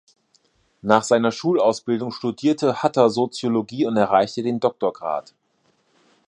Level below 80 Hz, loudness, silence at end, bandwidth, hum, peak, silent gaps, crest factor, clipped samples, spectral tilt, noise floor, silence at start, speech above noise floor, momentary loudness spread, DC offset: -66 dBFS; -21 LUFS; 1.1 s; 11 kHz; none; 0 dBFS; none; 22 dB; under 0.1%; -5.5 dB/octave; -65 dBFS; 0.85 s; 45 dB; 8 LU; under 0.1%